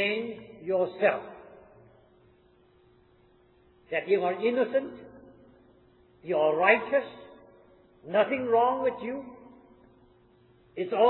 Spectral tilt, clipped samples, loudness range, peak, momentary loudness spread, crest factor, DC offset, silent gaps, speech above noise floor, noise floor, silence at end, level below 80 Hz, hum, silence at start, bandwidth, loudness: -8.5 dB/octave; under 0.1%; 7 LU; -8 dBFS; 23 LU; 22 dB; under 0.1%; none; 35 dB; -62 dBFS; 0 s; -70 dBFS; none; 0 s; 4.2 kHz; -27 LUFS